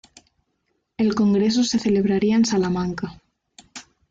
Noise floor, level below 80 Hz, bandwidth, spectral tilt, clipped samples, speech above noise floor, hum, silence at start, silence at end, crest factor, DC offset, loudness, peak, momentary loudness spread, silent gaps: -72 dBFS; -54 dBFS; 7.8 kHz; -5.5 dB/octave; under 0.1%; 53 dB; none; 1 s; 0.3 s; 12 dB; under 0.1%; -20 LUFS; -10 dBFS; 22 LU; none